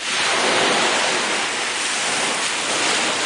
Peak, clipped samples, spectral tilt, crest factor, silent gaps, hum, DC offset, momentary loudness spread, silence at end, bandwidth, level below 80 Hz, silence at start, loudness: -6 dBFS; under 0.1%; -0.5 dB/octave; 14 dB; none; none; under 0.1%; 4 LU; 0 s; 10.5 kHz; -66 dBFS; 0 s; -18 LUFS